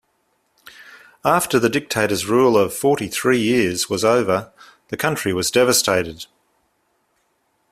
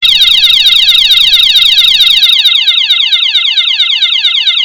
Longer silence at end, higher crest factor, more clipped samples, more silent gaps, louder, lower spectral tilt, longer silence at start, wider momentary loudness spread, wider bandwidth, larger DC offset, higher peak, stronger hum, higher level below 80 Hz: first, 1.45 s vs 0 s; first, 18 dB vs 6 dB; second, under 0.1% vs 4%; neither; second, -18 LUFS vs -3 LUFS; first, -3.5 dB/octave vs 3 dB/octave; first, 0.8 s vs 0 s; first, 9 LU vs 4 LU; second, 16 kHz vs over 20 kHz; neither; about the same, -2 dBFS vs 0 dBFS; neither; second, -56 dBFS vs -42 dBFS